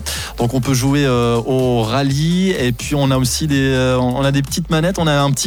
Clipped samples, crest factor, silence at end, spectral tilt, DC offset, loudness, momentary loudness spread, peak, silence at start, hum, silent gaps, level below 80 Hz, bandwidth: under 0.1%; 12 dB; 0 s; -5 dB/octave; under 0.1%; -16 LUFS; 4 LU; -4 dBFS; 0 s; none; none; -32 dBFS; 19 kHz